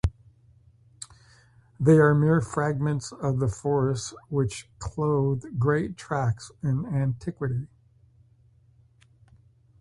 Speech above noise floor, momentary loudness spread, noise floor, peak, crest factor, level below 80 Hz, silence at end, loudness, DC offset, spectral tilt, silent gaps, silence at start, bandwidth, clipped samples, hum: 35 dB; 15 LU; -59 dBFS; -6 dBFS; 20 dB; -46 dBFS; 2.15 s; -26 LUFS; under 0.1%; -7 dB/octave; none; 0.05 s; 11.5 kHz; under 0.1%; none